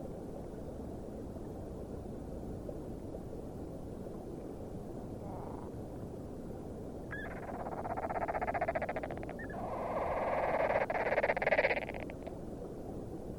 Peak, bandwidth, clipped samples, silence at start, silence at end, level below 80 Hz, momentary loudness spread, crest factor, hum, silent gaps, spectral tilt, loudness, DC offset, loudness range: -18 dBFS; over 20 kHz; under 0.1%; 0 s; 0 s; -52 dBFS; 13 LU; 22 dB; none; none; -7 dB/octave; -39 LUFS; under 0.1%; 11 LU